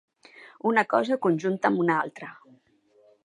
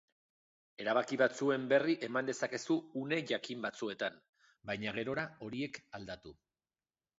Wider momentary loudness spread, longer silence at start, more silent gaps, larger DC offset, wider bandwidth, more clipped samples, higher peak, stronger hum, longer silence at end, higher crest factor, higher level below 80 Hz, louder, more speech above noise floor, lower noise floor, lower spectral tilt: about the same, 13 LU vs 14 LU; second, 0.4 s vs 0.8 s; second, none vs 4.29-4.33 s; neither; first, 10.5 kHz vs 7.6 kHz; neither; first, -6 dBFS vs -16 dBFS; neither; about the same, 0.9 s vs 0.85 s; about the same, 20 dB vs 22 dB; second, -80 dBFS vs -74 dBFS; first, -25 LUFS vs -36 LUFS; second, 38 dB vs over 54 dB; second, -62 dBFS vs under -90 dBFS; first, -7 dB/octave vs -3.5 dB/octave